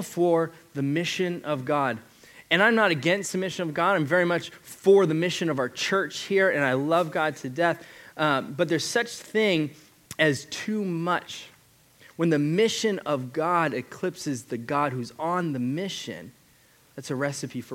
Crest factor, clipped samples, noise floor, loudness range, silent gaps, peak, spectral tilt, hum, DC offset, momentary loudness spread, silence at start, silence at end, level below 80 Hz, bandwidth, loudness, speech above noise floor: 20 dB; under 0.1%; -59 dBFS; 5 LU; none; -6 dBFS; -5 dB/octave; none; under 0.1%; 11 LU; 0 s; 0 s; -72 dBFS; 17 kHz; -25 LUFS; 33 dB